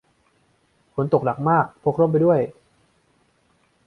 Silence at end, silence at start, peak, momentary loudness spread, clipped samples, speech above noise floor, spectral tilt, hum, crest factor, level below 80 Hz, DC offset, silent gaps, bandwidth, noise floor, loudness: 1.35 s; 0.95 s; -4 dBFS; 10 LU; under 0.1%; 44 dB; -10.5 dB/octave; none; 20 dB; -60 dBFS; under 0.1%; none; 4.7 kHz; -63 dBFS; -21 LUFS